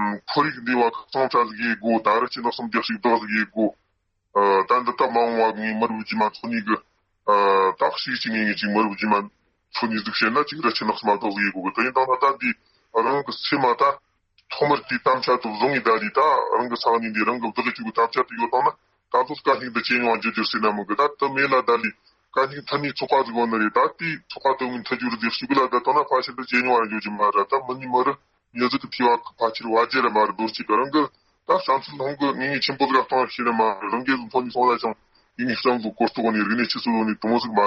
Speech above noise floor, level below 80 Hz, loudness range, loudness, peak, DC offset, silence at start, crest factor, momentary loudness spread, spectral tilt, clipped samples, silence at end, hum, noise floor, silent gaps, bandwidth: 50 dB; -68 dBFS; 1 LU; -22 LUFS; -6 dBFS; under 0.1%; 0 s; 16 dB; 6 LU; -2 dB/octave; under 0.1%; 0 s; none; -72 dBFS; none; 7.2 kHz